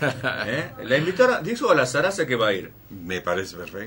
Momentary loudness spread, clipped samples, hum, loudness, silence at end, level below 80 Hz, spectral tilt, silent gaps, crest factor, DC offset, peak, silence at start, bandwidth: 11 LU; under 0.1%; none; -23 LUFS; 0 s; -56 dBFS; -4.5 dB/octave; none; 18 dB; under 0.1%; -4 dBFS; 0 s; 16.5 kHz